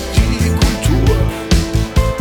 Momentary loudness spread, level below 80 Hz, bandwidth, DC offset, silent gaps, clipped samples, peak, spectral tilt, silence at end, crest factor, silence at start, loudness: 3 LU; -18 dBFS; 20 kHz; under 0.1%; none; under 0.1%; 0 dBFS; -5.5 dB/octave; 0 s; 14 dB; 0 s; -15 LUFS